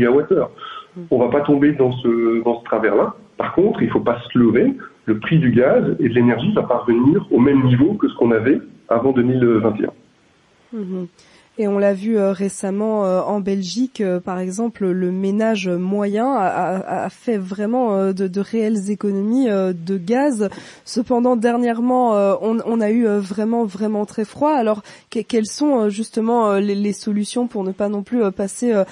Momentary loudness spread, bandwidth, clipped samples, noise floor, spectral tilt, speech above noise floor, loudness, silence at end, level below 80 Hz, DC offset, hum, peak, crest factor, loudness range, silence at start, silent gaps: 9 LU; 11.5 kHz; under 0.1%; -55 dBFS; -7 dB/octave; 38 dB; -18 LUFS; 0 s; -56 dBFS; under 0.1%; none; -4 dBFS; 14 dB; 4 LU; 0 s; none